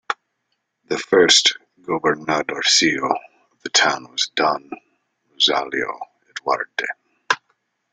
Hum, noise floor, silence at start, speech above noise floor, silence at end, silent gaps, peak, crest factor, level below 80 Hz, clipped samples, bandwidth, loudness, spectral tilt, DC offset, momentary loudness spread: none; -74 dBFS; 0.1 s; 55 dB; 0.55 s; none; 0 dBFS; 20 dB; -64 dBFS; under 0.1%; 11 kHz; -19 LUFS; -1 dB/octave; under 0.1%; 18 LU